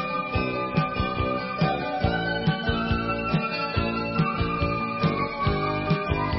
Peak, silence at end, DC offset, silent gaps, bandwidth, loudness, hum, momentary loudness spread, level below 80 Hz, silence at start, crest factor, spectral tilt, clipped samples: -10 dBFS; 0 s; under 0.1%; none; 5.8 kHz; -26 LUFS; none; 1 LU; -38 dBFS; 0 s; 16 dB; -10.5 dB/octave; under 0.1%